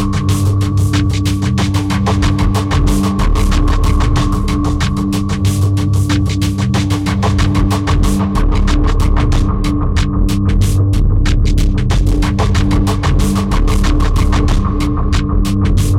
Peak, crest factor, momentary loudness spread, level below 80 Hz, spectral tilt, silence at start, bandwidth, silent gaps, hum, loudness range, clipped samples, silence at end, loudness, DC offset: -4 dBFS; 8 dB; 2 LU; -16 dBFS; -6 dB/octave; 0 s; 14.5 kHz; none; none; 1 LU; under 0.1%; 0 s; -14 LUFS; under 0.1%